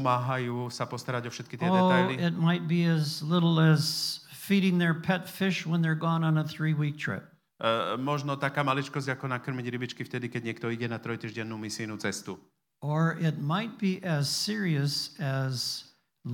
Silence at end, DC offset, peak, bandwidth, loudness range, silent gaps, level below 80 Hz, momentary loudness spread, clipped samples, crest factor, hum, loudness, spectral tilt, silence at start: 0 s; under 0.1%; -10 dBFS; 17.5 kHz; 7 LU; none; -78 dBFS; 11 LU; under 0.1%; 18 dB; none; -29 LUFS; -5.5 dB/octave; 0 s